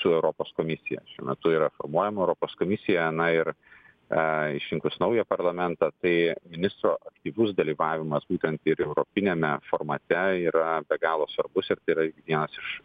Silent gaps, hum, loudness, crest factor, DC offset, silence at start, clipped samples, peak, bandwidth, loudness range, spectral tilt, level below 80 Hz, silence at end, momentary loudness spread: none; none; -27 LUFS; 18 dB; under 0.1%; 0 s; under 0.1%; -8 dBFS; 4.9 kHz; 1 LU; -9 dB/octave; -64 dBFS; 0.05 s; 6 LU